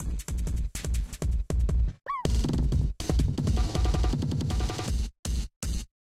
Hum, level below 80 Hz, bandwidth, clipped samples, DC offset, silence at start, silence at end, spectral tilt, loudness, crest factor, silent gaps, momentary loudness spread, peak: none; -28 dBFS; 14 kHz; under 0.1%; under 0.1%; 0 s; 0.15 s; -6 dB/octave; -30 LUFS; 16 dB; 5.19-5.23 s, 5.56-5.61 s; 6 LU; -10 dBFS